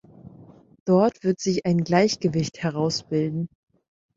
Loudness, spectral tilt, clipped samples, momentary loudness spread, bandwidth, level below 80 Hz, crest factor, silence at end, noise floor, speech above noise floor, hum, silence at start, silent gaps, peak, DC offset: -23 LUFS; -6 dB/octave; under 0.1%; 9 LU; 7.8 kHz; -60 dBFS; 18 dB; 0.7 s; -49 dBFS; 27 dB; none; 0.25 s; 0.80-0.86 s; -6 dBFS; under 0.1%